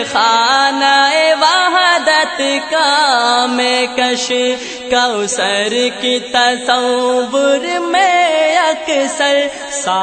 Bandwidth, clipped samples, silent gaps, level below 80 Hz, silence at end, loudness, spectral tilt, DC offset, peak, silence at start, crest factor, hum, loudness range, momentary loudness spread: 9.2 kHz; under 0.1%; none; -56 dBFS; 0 s; -12 LUFS; -1 dB/octave; under 0.1%; 0 dBFS; 0 s; 14 dB; none; 3 LU; 5 LU